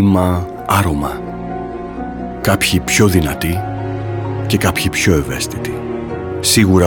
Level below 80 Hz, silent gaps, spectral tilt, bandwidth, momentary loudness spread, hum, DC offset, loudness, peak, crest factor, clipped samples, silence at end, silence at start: -34 dBFS; none; -4.5 dB/octave; 18 kHz; 13 LU; none; under 0.1%; -16 LUFS; 0 dBFS; 16 dB; under 0.1%; 0 s; 0 s